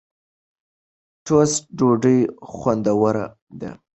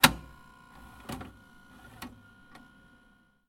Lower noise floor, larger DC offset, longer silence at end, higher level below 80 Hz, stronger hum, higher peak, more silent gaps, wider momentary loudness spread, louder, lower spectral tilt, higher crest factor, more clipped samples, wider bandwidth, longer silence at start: first, under -90 dBFS vs -64 dBFS; neither; second, 0.2 s vs 1.4 s; about the same, -56 dBFS vs -54 dBFS; neither; about the same, -4 dBFS vs -4 dBFS; first, 3.42-3.47 s vs none; first, 18 LU vs 13 LU; first, -19 LUFS vs -33 LUFS; first, -6 dB/octave vs -2 dB/octave; second, 18 dB vs 32 dB; neither; second, 8.4 kHz vs 16.5 kHz; first, 1.25 s vs 0 s